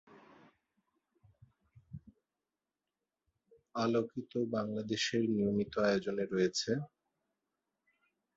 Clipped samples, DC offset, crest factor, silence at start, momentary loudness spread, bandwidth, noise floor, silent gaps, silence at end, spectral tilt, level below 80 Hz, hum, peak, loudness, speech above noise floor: under 0.1%; under 0.1%; 20 dB; 0.1 s; 19 LU; 7.4 kHz; under -90 dBFS; none; 1.5 s; -4.5 dB/octave; -70 dBFS; none; -18 dBFS; -34 LUFS; over 56 dB